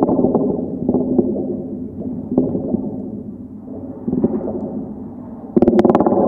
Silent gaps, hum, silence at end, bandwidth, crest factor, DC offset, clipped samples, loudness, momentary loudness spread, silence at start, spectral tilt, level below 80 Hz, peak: none; none; 0 s; 5.4 kHz; 18 dB; under 0.1%; under 0.1%; -19 LUFS; 18 LU; 0 s; -10.5 dB/octave; -46 dBFS; 0 dBFS